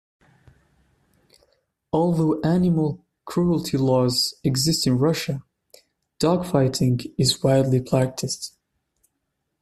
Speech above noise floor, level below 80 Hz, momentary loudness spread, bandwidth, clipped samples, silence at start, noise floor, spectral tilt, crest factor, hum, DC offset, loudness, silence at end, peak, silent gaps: 56 dB; -52 dBFS; 9 LU; 14.5 kHz; under 0.1%; 1.95 s; -77 dBFS; -5.5 dB/octave; 18 dB; none; under 0.1%; -22 LUFS; 1.15 s; -6 dBFS; none